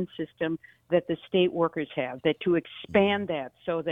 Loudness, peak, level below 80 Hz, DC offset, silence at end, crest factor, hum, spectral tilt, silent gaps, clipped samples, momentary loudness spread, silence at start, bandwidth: -28 LUFS; -8 dBFS; -64 dBFS; under 0.1%; 0 s; 20 dB; none; -8.5 dB/octave; none; under 0.1%; 8 LU; 0 s; 3.9 kHz